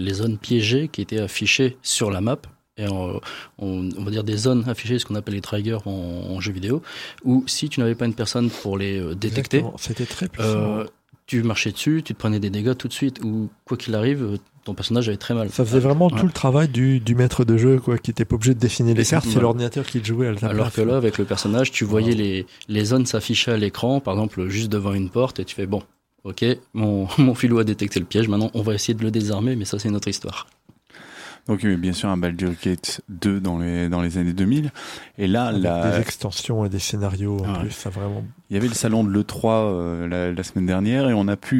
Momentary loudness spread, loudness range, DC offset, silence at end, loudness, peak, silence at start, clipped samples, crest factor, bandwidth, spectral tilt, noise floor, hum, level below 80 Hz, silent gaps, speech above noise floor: 10 LU; 6 LU; under 0.1%; 0 s; -22 LUFS; -4 dBFS; 0 s; under 0.1%; 18 dB; 16.5 kHz; -5.5 dB/octave; -49 dBFS; none; -48 dBFS; none; 28 dB